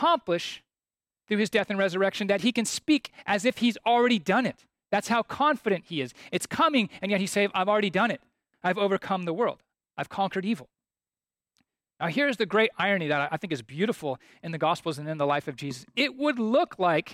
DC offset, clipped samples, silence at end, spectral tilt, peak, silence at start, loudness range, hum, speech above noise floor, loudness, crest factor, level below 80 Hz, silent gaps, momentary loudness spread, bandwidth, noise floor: under 0.1%; under 0.1%; 0 s; -4.5 dB/octave; -10 dBFS; 0 s; 5 LU; none; over 64 dB; -27 LUFS; 16 dB; -70 dBFS; none; 10 LU; 15.5 kHz; under -90 dBFS